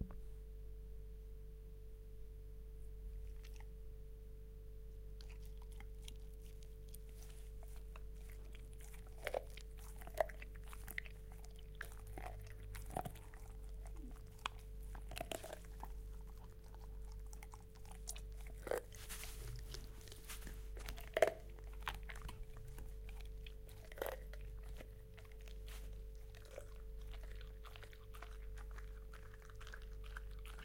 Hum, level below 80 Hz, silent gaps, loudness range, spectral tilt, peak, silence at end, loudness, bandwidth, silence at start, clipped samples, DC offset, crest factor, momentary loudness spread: none; -52 dBFS; none; 11 LU; -4 dB/octave; -16 dBFS; 0 s; -51 LUFS; 16.5 kHz; 0 s; under 0.1%; under 0.1%; 34 dB; 11 LU